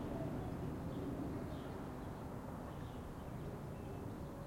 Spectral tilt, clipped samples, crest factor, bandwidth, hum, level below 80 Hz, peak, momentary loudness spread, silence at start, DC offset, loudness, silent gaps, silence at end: -7.5 dB/octave; under 0.1%; 14 dB; 16.5 kHz; none; -56 dBFS; -32 dBFS; 4 LU; 0 s; under 0.1%; -46 LUFS; none; 0 s